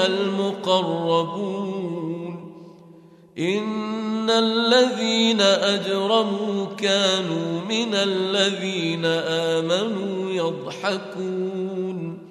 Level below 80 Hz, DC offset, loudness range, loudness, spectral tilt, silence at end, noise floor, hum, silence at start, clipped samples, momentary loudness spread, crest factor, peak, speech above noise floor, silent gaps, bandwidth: -72 dBFS; under 0.1%; 6 LU; -22 LUFS; -4.5 dB/octave; 0 s; -48 dBFS; none; 0 s; under 0.1%; 11 LU; 18 dB; -4 dBFS; 26 dB; none; 13 kHz